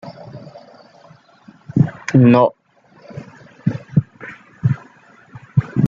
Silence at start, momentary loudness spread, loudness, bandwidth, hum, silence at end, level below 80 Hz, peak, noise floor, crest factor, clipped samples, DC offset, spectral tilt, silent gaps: 0.05 s; 25 LU; -17 LUFS; 7.4 kHz; none; 0 s; -50 dBFS; -2 dBFS; -47 dBFS; 18 dB; under 0.1%; under 0.1%; -9 dB/octave; none